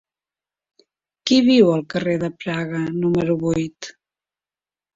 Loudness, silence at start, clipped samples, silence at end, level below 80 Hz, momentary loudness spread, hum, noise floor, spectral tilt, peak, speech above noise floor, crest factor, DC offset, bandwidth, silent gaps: -19 LUFS; 1.25 s; under 0.1%; 1.05 s; -54 dBFS; 15 LU; none; under -90 dBFS; -6 dB/octave; -2 dBFS; over 71 dB; 18 dB; under 0.1%; 7.8 kHz; none